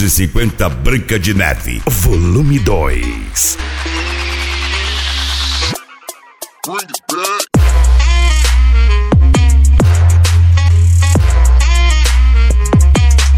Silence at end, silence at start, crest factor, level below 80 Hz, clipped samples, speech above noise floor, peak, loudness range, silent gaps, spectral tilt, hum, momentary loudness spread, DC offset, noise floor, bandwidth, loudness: 0 s; 0 s; 10 dB; -12 dBFS; under 0.1%; 21 dB; 0 dBFS; 7 LU; none; -4.5 dB/octave; none; 9 LU; under 0.1%; -34 dBFS; 19 kHz; -12 LUFS